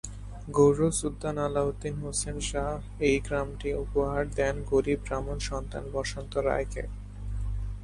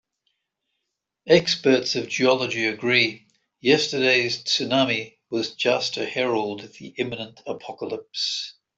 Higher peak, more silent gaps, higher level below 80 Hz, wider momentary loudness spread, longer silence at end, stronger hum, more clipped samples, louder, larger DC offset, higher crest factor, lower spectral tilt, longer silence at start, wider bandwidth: second, -10 dBFS vs -4 dBFS; neither; first, -38 dBFS vs -66 dBFS; second, 10 LU vs 13 LU; second, 0 s vs 0.25 s; first, 50 Hz at -40 dBFS vs none; neither; second, -29 LUFS vs -22 LUFS; neither; about the same, 20 dB vs 20 dB; first, -5 dB/octave vs -3.5 dB/octave; second, 0.05 s vs 1.25 s; first, 11.5 kHz vs 8.2 kHz